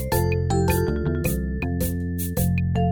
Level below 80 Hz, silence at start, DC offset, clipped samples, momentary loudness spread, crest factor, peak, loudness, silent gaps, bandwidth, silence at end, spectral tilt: -32 dBFS; 0 s; 0.7%; under 0.1%; 5 LU; 14 dB; -10 dBFS; -24 LUFS; none; over 20 kHz; 0 s; -6.5 dB/octave